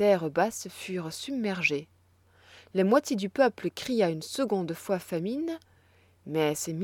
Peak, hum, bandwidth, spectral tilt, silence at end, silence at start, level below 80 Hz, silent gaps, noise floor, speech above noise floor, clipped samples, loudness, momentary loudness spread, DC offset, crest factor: -10 dBFS; none; 18 kHz; -5 dB/octave; 0 s; 0 s; -70 dBFS; none; -62 dBFS; 34 dB; under 0.1%; -29 LUFS; 10 LU; under 0.1%; 20 dB